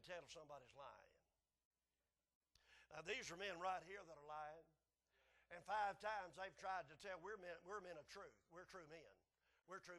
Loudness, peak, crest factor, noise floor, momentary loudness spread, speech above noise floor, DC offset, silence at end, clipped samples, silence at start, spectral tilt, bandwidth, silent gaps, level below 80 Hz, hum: -53 LUFS; -34 dBFS; 20 dB; under -90 dBFS; 15 LU; over 37 dB; under 0.1%; 0 s; under 0.1%; 0 s; -2.5 dB/octave; 12 kHz; 1.65-1.71 s, 2.35-2.41 s; -84 dBFS; none